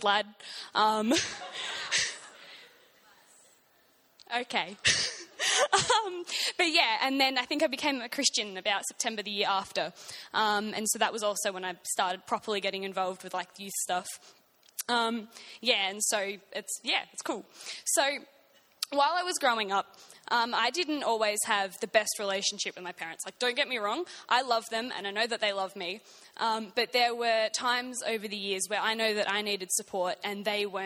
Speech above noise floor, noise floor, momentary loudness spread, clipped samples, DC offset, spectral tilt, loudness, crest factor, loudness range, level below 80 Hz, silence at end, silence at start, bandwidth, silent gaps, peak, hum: 35 dB; -65 dBFS; 11 LU; under 0.1%; under 0.1%; -1 dB/octave; -29 LUFS; 22 dB; 6 LU; -72 dBFS; 0 s; 0 s; 17.5 kHz; none; -8 dBFS; none